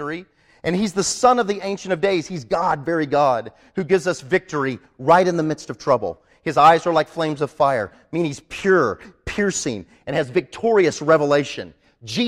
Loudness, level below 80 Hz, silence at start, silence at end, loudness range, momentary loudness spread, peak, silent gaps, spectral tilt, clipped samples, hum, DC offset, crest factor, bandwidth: -20 LUFS; -52 dBFS; 0 s; 0 s; 3 LU; 13 LU; -2 dBFS; none; -4.5 dB/octave; under 0.1%; none; under 0.1%; 18 dB; 13 kHz